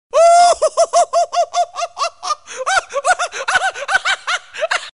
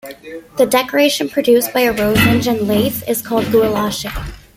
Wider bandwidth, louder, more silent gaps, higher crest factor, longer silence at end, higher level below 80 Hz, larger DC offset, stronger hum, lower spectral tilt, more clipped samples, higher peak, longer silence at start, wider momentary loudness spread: second, 11 kHz vs 16.5 kHz; about the same, -16 LUFS vs -15 LUFS; neither; about the same, 12 dB vs 16 dB; second, 0.05 s vs 0.2 s; second, -54 dBFS vs -38 dBFS; first, 0.3% vs under 0.1%; neither; second, 1.5 dB/octave vs -4.5 dB/octave; neither; second, -4 dBFS vs 0 dBFS; about the same, 0.15 s vs 0.05 s; about the same, 11 LU vs 13 LU